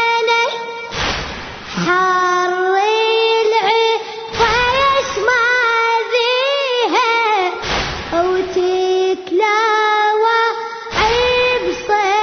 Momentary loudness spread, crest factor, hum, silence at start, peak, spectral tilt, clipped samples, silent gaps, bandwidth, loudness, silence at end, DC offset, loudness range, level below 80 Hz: 7 LU; 14 dB; none; 0 s; -2 dBFS; -3.5 dB/octave; under 0.1%; none; 6.6 kHz; -15 LUFS; 0 s; under 0.1%; 2 LU; -40 dBFS